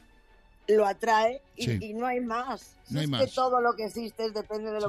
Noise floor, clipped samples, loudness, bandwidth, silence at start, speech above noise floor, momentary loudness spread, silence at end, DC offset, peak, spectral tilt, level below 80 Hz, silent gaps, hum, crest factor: -58 dBFS; under 0.1%; -28 LUFS; 15 kHz; 0.7 s; 30 dB; 10 LU; 0 s; under 0.1%; -14 dBFS; -5.5 dB/octave; -60 dBFS; none; none; 14 dB